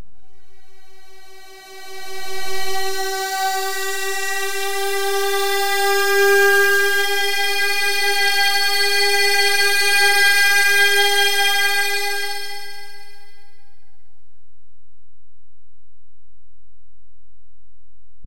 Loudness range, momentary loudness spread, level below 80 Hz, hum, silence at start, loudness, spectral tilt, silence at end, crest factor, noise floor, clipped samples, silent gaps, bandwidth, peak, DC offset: 12 LU; 15 LU; -62 dBFS; none; 0 s; -16 LUFS; 0 dB/octave; 0 s; 14 dB; -65 dBFS; under 0.1%; none; 16 kHz; -4 dBFS; 6%